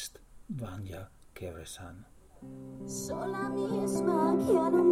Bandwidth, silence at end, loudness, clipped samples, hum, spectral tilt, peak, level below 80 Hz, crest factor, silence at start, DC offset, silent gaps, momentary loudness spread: 16 kHz; 0 s; -31 LUFS; under 0.1%; none; -6 dB/octave; -14 dBFS; -58 dBFS; 18 dB; 0 s; under 0.1%; none; 21 LU